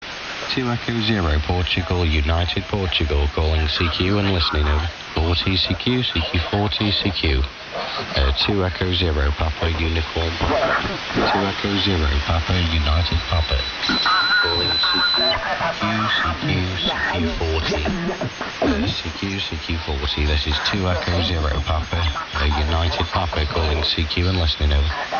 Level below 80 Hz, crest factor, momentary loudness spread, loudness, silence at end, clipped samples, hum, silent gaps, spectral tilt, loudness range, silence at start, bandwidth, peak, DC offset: -28 dBFS; 16 dB; 6 LU; -20 LUFS; 0 s; under 0.1%; none; none; -5.5 dB/octave; 4 LU; 0 s; 7 kHz; -4 dBFS; under 0.1%